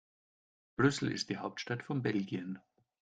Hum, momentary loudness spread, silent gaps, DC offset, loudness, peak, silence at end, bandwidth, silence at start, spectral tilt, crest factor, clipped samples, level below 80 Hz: none; 14 LU; none; under 0.1%; -35 LUFS; -14 dBFS; 0.4 s; 9.4 kHz; 0.8 s; -5.5 dB/octave; 22 dB; under 0.1%; -70 dBFS